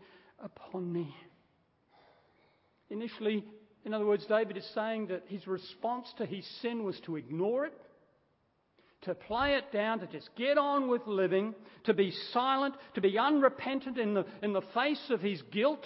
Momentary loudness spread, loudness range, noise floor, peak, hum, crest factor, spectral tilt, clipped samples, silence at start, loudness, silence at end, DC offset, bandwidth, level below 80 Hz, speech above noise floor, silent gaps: 12 LU; 8 LU; -74 dBFS; -12 dBFS; none; 22 dB; -3.5 dB/octave; under 0.1%; 0.4 s; -33 LUFS; 0 s; under 0.1%; 5.6 kHz; -68 dBFS; 42 dB; none